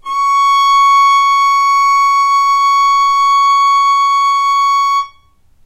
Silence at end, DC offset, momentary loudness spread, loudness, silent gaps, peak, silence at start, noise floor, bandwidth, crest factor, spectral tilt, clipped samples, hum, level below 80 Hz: 0.6 s; under 0.1%; 3 LU; -10 LUFS; none; -2 dBFS; 0.05 s; -48 dBFS; 15.5 kHz; 8 dB; 3 dB/octave; under 0.1%; none; -52 dBFS